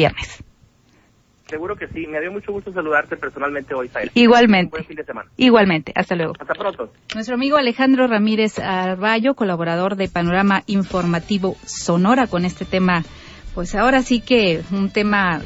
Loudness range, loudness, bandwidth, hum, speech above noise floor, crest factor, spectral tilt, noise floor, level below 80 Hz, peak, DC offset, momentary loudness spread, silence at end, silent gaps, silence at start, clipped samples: 6 LU; -18 LUFS; 8 kHz; none; 38 dB; 16 dB; -5.5 dB/octave; -56 dBFS; -42 dBFS; -2 dBFS; under 0.1%; 14 LU; 0 s; none; 0 s; under 0.1%